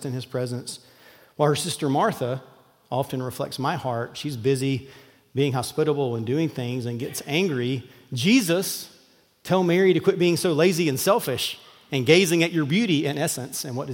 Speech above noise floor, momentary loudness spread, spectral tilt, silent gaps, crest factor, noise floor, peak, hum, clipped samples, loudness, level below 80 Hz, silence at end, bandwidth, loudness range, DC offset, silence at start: 35 dB; 12 LU; -5 dB/octave; none; 22 dB; -58 dBFS; -2 dBFS; none; under 0.1%; -24 LUFS; -68 dBFS; 0 s; 17 kHz; 6 LU; under 0.1%; 0 s